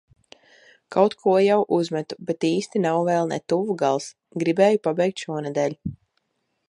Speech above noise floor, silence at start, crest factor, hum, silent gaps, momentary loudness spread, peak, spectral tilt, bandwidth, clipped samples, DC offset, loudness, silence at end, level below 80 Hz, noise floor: 53 dB; 0.9 s; 20 dB; none; none; 10 LU; -4 dBFS; -6 dB/octave; 11 kHz; under 0.1%; under 0.1%; -22 LUFS; 0.75 s; -60 dBFS; -75 dBFS